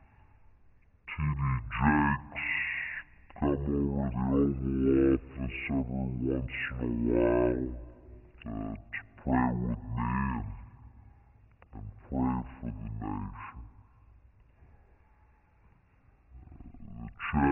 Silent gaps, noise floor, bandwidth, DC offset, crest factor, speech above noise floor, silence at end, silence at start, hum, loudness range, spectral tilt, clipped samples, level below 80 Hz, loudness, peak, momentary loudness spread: none; -63 dBFS; 3.2 kHz; under 0.1%; 20 dB; 32 dB; 0 s; 1.05 s; none; 9 LU; -7 dB/octave; under 0.1%; -44 dBFS; -31 LUFS; -12 dBFS; 21 LU